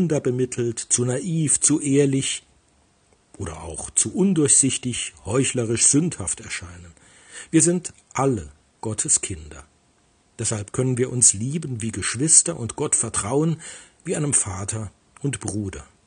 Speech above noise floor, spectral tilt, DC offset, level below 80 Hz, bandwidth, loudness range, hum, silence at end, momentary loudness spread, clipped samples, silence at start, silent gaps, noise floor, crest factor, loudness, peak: 39 dB; -4 dB/octave; under 0.1%; -52 dBFS; 10.5 kHz; 4 LU; none; 0.25 s; 16 LU; under 0.1%; 0 s; none; -61 dBFS; 22 dB; -21 LUFS; 0 dBFS